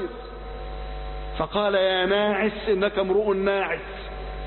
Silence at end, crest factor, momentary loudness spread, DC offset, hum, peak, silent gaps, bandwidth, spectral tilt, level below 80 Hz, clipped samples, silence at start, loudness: 0 s; 16 dB; 15 LU; under 0.1%; none; -10 dBFS; none; 4.3 kHz; -9.5 dB/octave; -38 dBFS; under 0.1%; 0 s; -23 LUFS